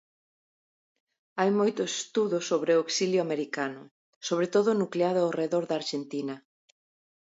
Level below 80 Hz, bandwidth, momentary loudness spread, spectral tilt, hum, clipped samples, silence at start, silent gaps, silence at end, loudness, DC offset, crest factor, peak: -80 dBFS; 8 kHz; 10 LU; -4.5 dB/octave; none; under 0.1%; 1.35 s; 3.91-4.21 s; 0.8 s; -28 LUFS; under 0.1%; 18 dB; -12 dBFS